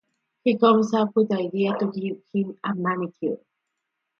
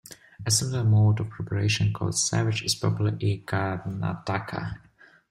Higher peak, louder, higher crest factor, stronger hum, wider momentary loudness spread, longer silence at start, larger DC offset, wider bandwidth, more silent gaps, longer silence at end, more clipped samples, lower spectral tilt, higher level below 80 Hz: first, -6 dBFS vs -10 dBFS; about the same, -24 LUFS vs -26 LUFS; about the same, 20 dB vs 16 dB; neither; about the same, 12 LU vs 12 LU; first, 0.45 s vs 0.1 s; neither; second, 6.8 kHz vs 14.5 kHz; neither; first, 0.85 s vs 0.55 s; neither; first, -7 dB/octave vs -4.5 dB/octave; second, -74 dBFS vs -54 dBFS